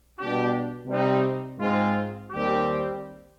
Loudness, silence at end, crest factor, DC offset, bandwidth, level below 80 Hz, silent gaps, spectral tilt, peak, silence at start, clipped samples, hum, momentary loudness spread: -26 LUFS; 0.15 s; 16 dB; under 0.1%; 7.4 kHz; -58 dBFS; none; -8 dB/octave; -12 dBFS; 0.2 s; under 0.1%; none; 6 LU